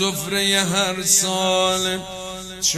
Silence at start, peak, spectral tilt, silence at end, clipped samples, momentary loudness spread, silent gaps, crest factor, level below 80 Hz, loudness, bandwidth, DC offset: 0 s; -4 dBFS; -2 dB/octave; 0 s; under 0.1%; 14 LU; none; 16 dB; -50 dBFS; -18 LUFS; 15.5 kHz; under 0.1%